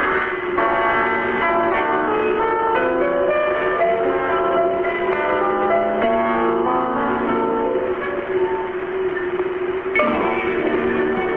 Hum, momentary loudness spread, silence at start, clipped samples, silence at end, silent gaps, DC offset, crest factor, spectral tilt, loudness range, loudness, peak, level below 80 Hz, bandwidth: none; 5 LU; 0 s; under 0.1%; 0 s; none; under 0.1%; 14 dB; -8 dB/octave; 3 LU; -19 LUFS; -4 dBFS; -46 dBFS; 4.4 kHz